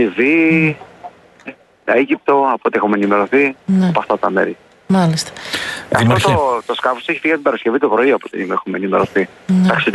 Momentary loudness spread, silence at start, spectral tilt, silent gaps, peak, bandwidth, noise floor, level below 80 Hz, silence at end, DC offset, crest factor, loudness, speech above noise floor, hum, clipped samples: 9 LU; 0 s; -6 dB/octave; none; 0 dBFS; 12 kHz; -37 dBFS; -50 dBFS; 0 s; under 0.1%; 16 dB; -15 LUFS; 23 dB; none; under 0.1%